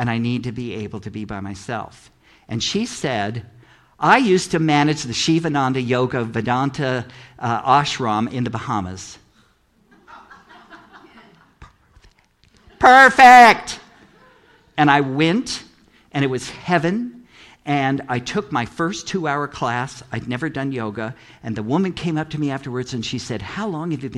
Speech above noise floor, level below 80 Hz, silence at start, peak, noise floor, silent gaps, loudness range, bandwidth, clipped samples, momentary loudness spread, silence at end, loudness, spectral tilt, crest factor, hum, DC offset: 40 dB; -52 dBFS; 0 s; 0 dBFS; -58 dBFS; none; 13 LU; 14 kHz; under 0.1%; 16 LU; 0 s; -18 LUFS; -5 dB/octave; 20 dB; none; under 0.1%